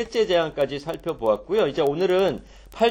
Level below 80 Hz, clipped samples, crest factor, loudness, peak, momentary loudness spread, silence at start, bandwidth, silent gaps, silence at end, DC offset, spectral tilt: -50 dBFS; under 0.1%; 16 dB; -23 LUFS; -6 dBFS; 8 LU; 0 s; 17 kHz; none; 0 s; under 0.1%; -5.5 dB/octave